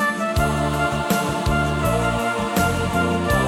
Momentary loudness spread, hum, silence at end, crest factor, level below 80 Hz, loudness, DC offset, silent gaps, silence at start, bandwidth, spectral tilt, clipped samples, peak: 1 LU; none; 0 s; 14 dB; -32 dBFS; -21 LUFS; under 0.1%; none; 0 s; 18 kHz; -5.5 dB/octave; under 0.1%; -6 dBFS